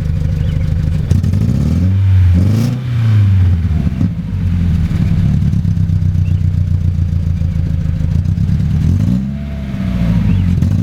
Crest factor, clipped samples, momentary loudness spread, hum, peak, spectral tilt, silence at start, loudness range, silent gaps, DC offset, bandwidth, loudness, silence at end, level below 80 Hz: 12 dB; under 0.1%; 6 LU; none; 0 dBFS; -9 dB/octave; 0 s; 3 LU; none; under 0.1%; 7.2 kHz; -14 LUFS; 0 s; -22 dBFS